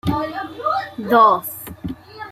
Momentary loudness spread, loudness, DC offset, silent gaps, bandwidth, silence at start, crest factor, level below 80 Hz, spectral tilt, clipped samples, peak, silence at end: 19 LU; -18 LUFS; under 0.1%; none; 16 kHz; 0.05 s; 18 dB; -48 dBFS; -5.5 dB/octave; under 0.1%; -2 dBFS; 0 s